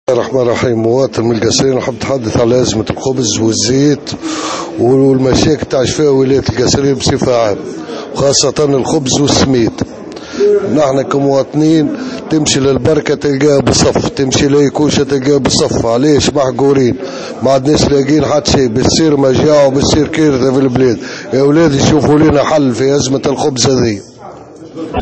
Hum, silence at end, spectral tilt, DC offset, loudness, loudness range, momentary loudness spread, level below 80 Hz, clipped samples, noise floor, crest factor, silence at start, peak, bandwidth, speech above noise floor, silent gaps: none; 0 s; -5 dB/octave; 0.1%; -11 LUFS; 2 LU; 7 LU; -34 dBFS; under 0.1%; -31 dBFS; 10 dB; 0.1 s; 0 dBFS; 8.8 kHz; 21 dB; none